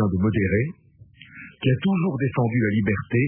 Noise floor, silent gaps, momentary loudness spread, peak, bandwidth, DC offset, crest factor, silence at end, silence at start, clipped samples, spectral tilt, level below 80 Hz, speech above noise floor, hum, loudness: -49 dBFS; none; 8 LU; -8 dBFS; 3.4 kHz; under 0.1%; 14 dB; 0 s; 0 s; under 0.1%; -12 dB/octave; -48 dBFS; 27 dB; none; -23 LUFS